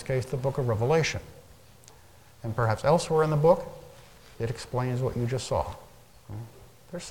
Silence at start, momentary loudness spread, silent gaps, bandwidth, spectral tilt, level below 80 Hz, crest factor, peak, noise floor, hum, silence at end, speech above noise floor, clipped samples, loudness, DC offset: 0 s; 19 LU; none; 17.5 kHz; -6 dB/octave; -50 dBFS; 18 dB; -10 dBFS; -55 dBFS; none; 0 s; 28 dB; under 0.1%; -27 LUFS; 0.1%